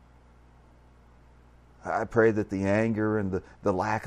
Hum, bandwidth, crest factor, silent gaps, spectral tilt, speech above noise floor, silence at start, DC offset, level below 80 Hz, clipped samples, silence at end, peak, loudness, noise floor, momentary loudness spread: 60 Hz at -55 dBFS; 9.8 kHz; 20 dB; none; -7.5 dB/octave; 29 dB; 1.85 s; under 0.1%; -56 dBFS; under 0.1%; 0 s; -10 dBFS; -27 LUFS; -56 dBFS; 9 LU